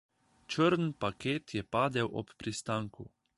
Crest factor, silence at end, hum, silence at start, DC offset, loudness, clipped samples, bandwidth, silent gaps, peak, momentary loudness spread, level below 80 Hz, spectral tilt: 18 dB; 0.3 s; none; 0.5 s; under 0.1%; -33 LUFS; under 0.1%; 11.5 kHz; none; -16 dBFS; 11 LU; -64 dBFS; -5.5 dB/octave